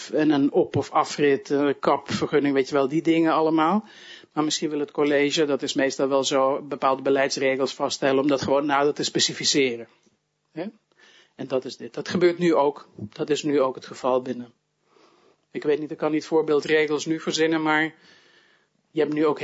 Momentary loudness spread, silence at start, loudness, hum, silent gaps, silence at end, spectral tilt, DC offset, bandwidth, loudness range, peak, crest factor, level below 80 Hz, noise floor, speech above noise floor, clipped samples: 12 LU; 0 s; -23 LUFS; none; none; 0 s; -4 dB/octave; under 0.1%; 8 kHz; 4 LU; -6 dBFS; 16 dB; -68 dBFS; -64 dBFS; 41 dB; under 0.1%